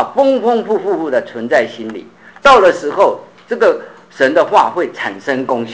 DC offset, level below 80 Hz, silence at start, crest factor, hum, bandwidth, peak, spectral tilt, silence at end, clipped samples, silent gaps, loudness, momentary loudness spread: 0.2%; -52 dBFS; 0 s; 14 dB; none; 8 kHz; 0 dBFS; -4.5 dB/octave; 0 s; under 0.1%; none; -13 LUFS; 14 LU